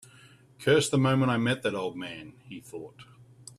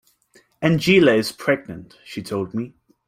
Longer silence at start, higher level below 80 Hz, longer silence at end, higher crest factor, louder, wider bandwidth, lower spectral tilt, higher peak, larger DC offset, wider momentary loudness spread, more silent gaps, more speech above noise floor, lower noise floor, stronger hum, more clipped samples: about the same, 0.6 s vs 0.6 s; second, -66 dBFS vs -56 dBFS; first, 0.55 s vs 0.4 s; about the same, 18 dB vs 18 dB; second, -26 LUFS vs -19 LUFS; second, 13.5 kHz vs 16 kHz; about the same, -5.5 dB/octave vs -6 dB/octave; second, -10 dBFS vs -4 dBFS; neither; about the same, 21 LU vs 21 LU; neither; second, 28 dB vs 38 dB; about the same, -56 dBFS vs -58 dBFS; neither; neither